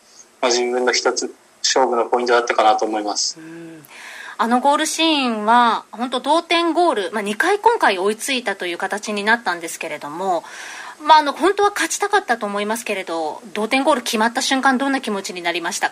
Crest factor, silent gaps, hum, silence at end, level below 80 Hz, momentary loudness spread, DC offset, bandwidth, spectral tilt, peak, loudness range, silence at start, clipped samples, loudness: 18 dB; none; none; 0 s; -68 dBFS; 11 LU; under 0.1%; 16 kHz; -2 dB/octave; -2 dBFS; 2 LU; 0.2 s; under 0.1%; -18 LUFS